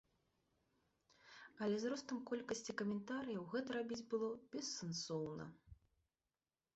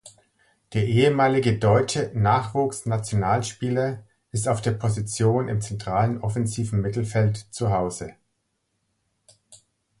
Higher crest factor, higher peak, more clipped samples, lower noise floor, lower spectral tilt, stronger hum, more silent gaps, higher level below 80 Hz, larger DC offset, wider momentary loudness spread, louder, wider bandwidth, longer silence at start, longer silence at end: about the same, 16 dB vs 18 dB; second, -30 dBFS vs -6 dBFS; neither; first, under -90 dBFS vs -75 dBFS; second, -4.5 dB/octave vs -6 dB/octave; neither; neither; second, -78 dBFS vs -48 dBFS; neither; about the same, 9 LU vs 8 LU; second, -45 LUFS vs -24 LUFS; second, 8 kHz vs 11.5 kHz; first, 1.25 s vs 0.05 s; first, 1 s vs 0.45 s